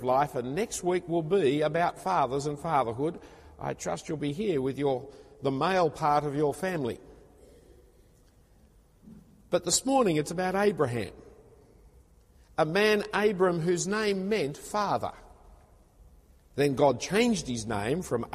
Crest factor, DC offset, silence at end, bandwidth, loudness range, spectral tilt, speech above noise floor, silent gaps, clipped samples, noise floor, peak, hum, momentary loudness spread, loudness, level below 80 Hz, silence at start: 18 dB; under 0.1%; 0 s; 15 kHz; 4 LU; -4.5 dB/octave; 32 dB; none; under 0.1%; -60 dBFS; -10 dBFS; none; 10 LU; -28 LUFS; -56 dBFS; 0 s